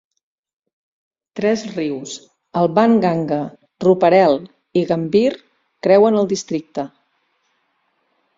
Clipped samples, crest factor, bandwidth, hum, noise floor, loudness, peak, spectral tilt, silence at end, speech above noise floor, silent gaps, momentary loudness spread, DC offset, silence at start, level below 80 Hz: under 0.1%; 18 dB; 7.8 kHz; none; -67 dBFS; -17 LUFS; -2 dBFS; -6 dB/octave; 1.5 s; 51 dB; none; 16 LU; under 0.1%; 1.35 s; -60 dBFS